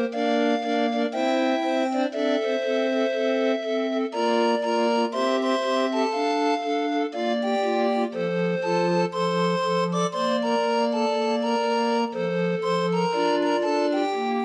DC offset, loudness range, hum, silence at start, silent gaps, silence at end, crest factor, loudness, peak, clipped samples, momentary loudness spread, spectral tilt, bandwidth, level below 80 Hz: under 0.1%; 1 LU; none; 0 s; none; 0 s; 12 dB; -24 LUFS; -10 dBFS; under 0.1%; 2 LU; -5.5 dB/octave; 10 kHz; -80 dBFS